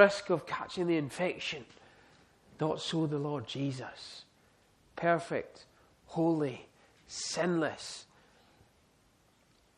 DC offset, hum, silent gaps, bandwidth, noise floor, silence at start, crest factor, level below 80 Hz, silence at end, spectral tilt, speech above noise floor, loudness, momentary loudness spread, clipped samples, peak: under 0.1%; none; none; 12 kHz; -67 dBFS; 0 s; 28 dB; -72 dBFS; 1.75 s; -5 dB/octave; 35 dB; -34 LUFS; 16 LU; under 0.1%; -8 dBFS